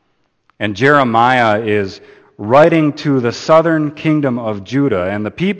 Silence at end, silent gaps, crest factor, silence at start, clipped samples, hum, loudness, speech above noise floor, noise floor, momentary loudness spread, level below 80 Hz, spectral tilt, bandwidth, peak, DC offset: 0 s; none; 14 dB; 0.6 s; under 0.1%; none; -13 LUFS; 46 dB; -59 dBFS; 10 LU; -52 dBFS; -7 dB/octave; 8.8 kHz; 0 dBFS; under 0.1%